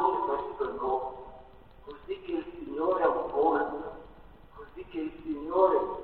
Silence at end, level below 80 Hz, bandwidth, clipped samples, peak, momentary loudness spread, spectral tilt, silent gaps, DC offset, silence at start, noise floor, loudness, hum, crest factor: 0 s; -56 dBFS; 4.4 kHz; under 0.1%; -10 dBFS; 22 LU; -8.5 dB/octave; none; 0.1%; 0 s; -53 dBFS; -30 LUFS; none; 20 dB